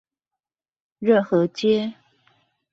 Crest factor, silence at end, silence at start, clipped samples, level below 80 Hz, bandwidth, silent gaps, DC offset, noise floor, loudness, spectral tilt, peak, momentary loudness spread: 18 dB; 0.8 s; 1 s; under 0.1%; -68 dBFS; 7.6 kHz; none; under 0.1%; -88 dBFS; -21 LUFS; -6.5 dB/octave; -6 dBFS; 8 LU